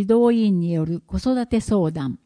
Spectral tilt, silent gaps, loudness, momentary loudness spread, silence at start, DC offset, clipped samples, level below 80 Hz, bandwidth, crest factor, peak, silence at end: -8 dB/octave; none; -21 LUFS; 8 LU; 0 s; under 0.1%; under 0.1%; -40 dBFS; 10.5 kHz; 14 dB; -6 dBFS; 0.1 s